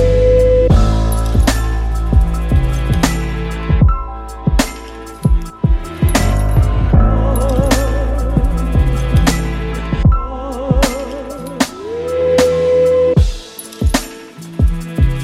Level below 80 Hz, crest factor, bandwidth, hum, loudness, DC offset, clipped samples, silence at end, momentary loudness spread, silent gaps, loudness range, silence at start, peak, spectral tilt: -16 dBFS; 14 dB; 14.5 kHz; none; -15 LUFS; under 0.1%; under 0.1%; 0 s; 11 LU; none; 3 LU; 0 s; 0 dBFS; -6 dB/octave